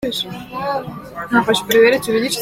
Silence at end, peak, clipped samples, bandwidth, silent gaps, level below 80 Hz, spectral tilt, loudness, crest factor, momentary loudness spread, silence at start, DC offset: 0 s; -2 dBFS; under 0.1%; 16.5 kHz; none; -50 dBFS; -3.5 dB/octave; -17 LUFS; 16 dB; 13 LU; 0 s; under 0.1%